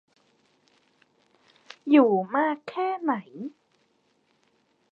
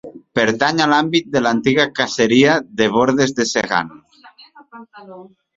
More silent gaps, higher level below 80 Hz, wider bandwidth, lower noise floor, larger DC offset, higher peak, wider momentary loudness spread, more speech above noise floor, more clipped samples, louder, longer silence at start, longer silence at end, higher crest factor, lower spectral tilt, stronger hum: neither; second, -86 dBFS vs -54 dBFS; second, 6 kHz vs 7.8 kHz; first, -69 dBFS vs -46 dBFS; neither; second, -6 dBFS vs 0 dBFS; first, 21 LU vs 6 LU; first, 45 dB vs 30 dB; neither; second, -24 LUFS vs -16 LUFS; first, 1.85 s vs 0.05 s; first, 1.4 s vs 0.35 s; about the same, 22 dB vs 18 dB; first, -7.5 dB/octave vs -4 dB/octave; neither